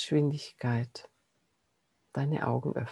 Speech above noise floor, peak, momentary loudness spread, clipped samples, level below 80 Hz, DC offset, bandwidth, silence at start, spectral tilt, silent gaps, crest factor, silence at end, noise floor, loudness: 46 dB; -14 dBFS; 12 LU; under 0.1%; -70 dBFS; under 0.1%; 11.5 kHz; 0 s; -7 dB/octave; none; 18 dB; 0 s; -76 dBFS; -32 LUFS